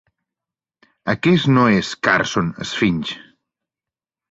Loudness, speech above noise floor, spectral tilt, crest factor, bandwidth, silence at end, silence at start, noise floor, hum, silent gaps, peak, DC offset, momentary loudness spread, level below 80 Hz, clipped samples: -18 LUFS; 72 dB; -5.5 dB/octave; 18 dB; 8 kHz; 1.15 s; 1.05 s; -90 dBFS; none; none; -2 dBFS; under 0.1%; 13 LU; -50 dBFS; under 0.1%